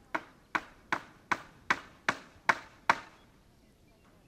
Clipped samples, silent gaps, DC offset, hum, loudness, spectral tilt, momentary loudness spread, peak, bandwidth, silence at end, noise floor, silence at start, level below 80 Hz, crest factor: under 0.1%; none; under 0.1%; none; -34 LUFS; -2.5 dB/octave; 6 LU; -6 dBFS; 16 kHz; 1.25 s; -62 dBFS; 0.15 s; -66 dBFS; 30 dB